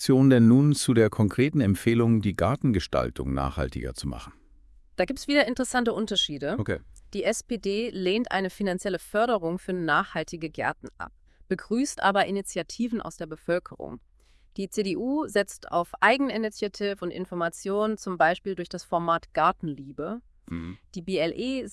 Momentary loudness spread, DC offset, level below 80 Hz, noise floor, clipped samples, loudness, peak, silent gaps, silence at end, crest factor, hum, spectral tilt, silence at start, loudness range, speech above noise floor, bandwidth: 15 LU; under 0.1%; -48 dBFS; -54 dBFS; under 0.1%; -26 LUFS; -6 dBFS; none; 0 s; 20 dB; none; -5.5 dB/octave; 0 s; 4 LU; 28 dB; 12 kHz